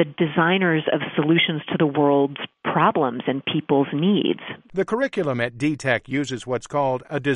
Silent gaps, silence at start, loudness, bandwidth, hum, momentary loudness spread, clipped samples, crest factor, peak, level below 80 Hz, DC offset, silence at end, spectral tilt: none; 0 s; -22 LUFS; 11 kHz; none; 7 LU; under 0.1%; 18 dB; -4 dBFS; -62 dBFS; under 0.1%; 0 s; -6.5 dB/octave